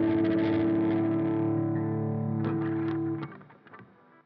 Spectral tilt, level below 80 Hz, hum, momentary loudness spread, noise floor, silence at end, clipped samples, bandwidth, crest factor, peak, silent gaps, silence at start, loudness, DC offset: -8.5 dB/octave; -66 dBFS; none; 6 LU; -54 dBFS; 0.4 s; under 0.1%; 4.9 kHz; 12 dB; -16 dBFS; none; 0 s; -28 LUFS; under 0.1%